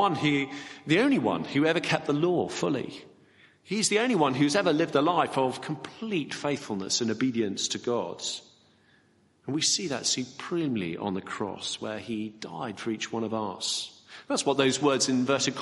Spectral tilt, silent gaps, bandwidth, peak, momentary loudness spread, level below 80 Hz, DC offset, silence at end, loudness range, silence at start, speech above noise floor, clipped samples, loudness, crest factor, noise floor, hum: -3.5 dB/octave; none; 11.5 kHz; -8 dBFS; 11 LU; -72 dBFS; under 0.1%; 0 s; 6 LU; 0 s; 36 dB; under 0.1%; -28 LUFS; 20 dB; -64 dBFS; none